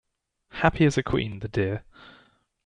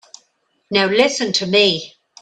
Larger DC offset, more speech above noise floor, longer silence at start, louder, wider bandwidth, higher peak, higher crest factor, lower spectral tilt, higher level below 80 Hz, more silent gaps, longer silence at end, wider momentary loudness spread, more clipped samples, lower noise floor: neither; second, 41 dB vs 48 dB; second, 0.55 s vs 0.7 s; second, -25 LUFS vs -16 LUFS; about the same, 10.5 kHz vs 10 kHz; second, -6 dBFS vs 0 dBFS; about the same, 22 dB vs 18 dB; first, -6.5 dB/octave vs -3 dB/octave; first, -46 dBFS vs -60 dBFS; neither; first, 0.55 s vs 0.35 s; first, 12 LU vs 9 LU; neither; about the same, -66 dBFS vs -64 dBFS